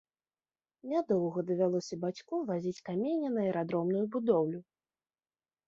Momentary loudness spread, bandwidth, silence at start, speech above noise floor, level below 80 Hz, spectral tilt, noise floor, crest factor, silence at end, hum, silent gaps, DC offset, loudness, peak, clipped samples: 7 LU; 7.8 kHz; 0.85 s; over 58 dB; -78 dBFS; -7.5 dB/octave; under -90 dBFS; 18 dB; 1.05 s; none; none; under 0.1%; -33 LUFS; -16 dBFS; under 0.1%